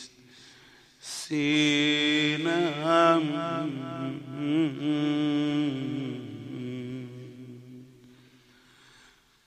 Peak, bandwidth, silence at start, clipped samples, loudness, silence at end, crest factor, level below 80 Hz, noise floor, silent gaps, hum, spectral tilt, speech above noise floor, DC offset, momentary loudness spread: -8 dBFS; 12 kHz; 0 s; under 0.1%; -27 LUFS; 1.6 s; 22 dB; -72 dBFS; -59 dBFS; none; none; -5 dB/octave; 34 dB; under 0.1%; 21 LU